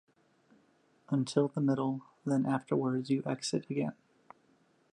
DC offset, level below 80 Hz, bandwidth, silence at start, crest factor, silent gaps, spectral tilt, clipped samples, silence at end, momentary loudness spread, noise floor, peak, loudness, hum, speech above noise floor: under 0.1%; -78 dBFS; 11.5 kHz; 1.1 s; 20 dB; none; -6.5 dB/octave; under 0.1%; 1 s; 6 LU; -69 dBFS; -14 dBFS; -33 LUFS; none; 37 dB